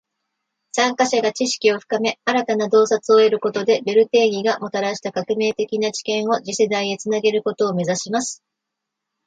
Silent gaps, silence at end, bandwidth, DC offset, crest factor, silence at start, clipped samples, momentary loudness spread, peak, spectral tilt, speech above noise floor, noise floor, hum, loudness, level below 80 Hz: none; 0.9 s; 9.2 kHz; under 0.1%; 16 dB; 0.75 s; under 0.1%; 8 LU; -4 dBFS; -3.5 dB/octave; 62 dB; -81 dBFS; none; -19 LUFS; -70 dBFS